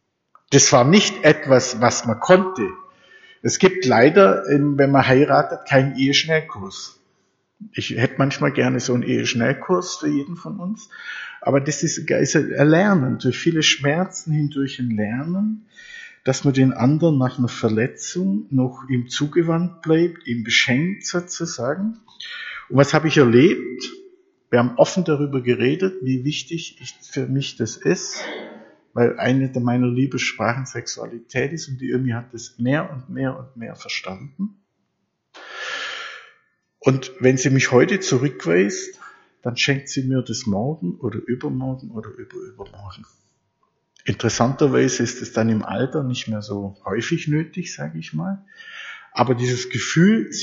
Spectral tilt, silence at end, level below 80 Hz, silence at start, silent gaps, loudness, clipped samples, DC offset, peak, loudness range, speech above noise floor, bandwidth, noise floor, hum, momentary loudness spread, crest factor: -5 dB/octave; 0 s; -60 dBFS; 0.5 s; none; -20 LUFS; under 0.1%; under 0.1%; 0 dBFS; 10 LU; 53 dB; 7.8 kHz; -73 dBFS; none; 17 LU; 20 dB